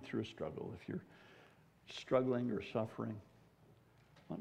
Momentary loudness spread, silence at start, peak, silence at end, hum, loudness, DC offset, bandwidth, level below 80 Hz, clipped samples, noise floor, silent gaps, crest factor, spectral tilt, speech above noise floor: 18 LU; 0 s; -20 dBFS; 0 s; none; -41 LUFS; under 0.1%; 11 kHz; -74 dBFS; under 0.1%; -67 dBFS; none; 22 dB; -7 dB/octave; 26 dB